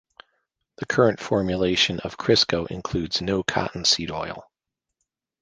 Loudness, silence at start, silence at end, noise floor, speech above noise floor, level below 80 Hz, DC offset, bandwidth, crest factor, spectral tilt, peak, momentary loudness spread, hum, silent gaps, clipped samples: -22 LUFS; 0.8 s; 1 s; -80 dBFS; 57 dB; -48 dBFS; under 0.1%; 10 kHz; 24 dB; -4 dB/octave; -2 dBFS; 11 LU; none; none; under 0.1%